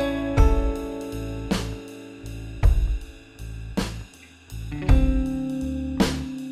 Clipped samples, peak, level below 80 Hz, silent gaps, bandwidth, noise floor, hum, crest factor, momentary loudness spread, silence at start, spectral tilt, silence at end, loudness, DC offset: under 0.1%; -4 dBFS; -26 dBFS; none; 14 kHz; -46 dBFS; none; 20 dB; 18 LU; 0 s; -6.5 dB/octave; 0 s; -26 LUFS; under 0.1%